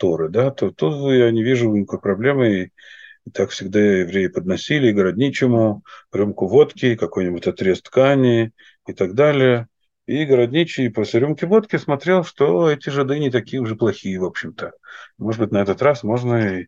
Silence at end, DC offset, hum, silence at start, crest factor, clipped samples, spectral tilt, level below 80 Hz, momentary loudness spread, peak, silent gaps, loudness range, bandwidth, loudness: 0.05 s; under 0.1%; none; 0 s; 16 dB; under 0.1%; -7 dB/octave; -60 dBFS; 10 LU; -2 dBFS; none; 3 LU; 7.6 kHz; -18 LUFS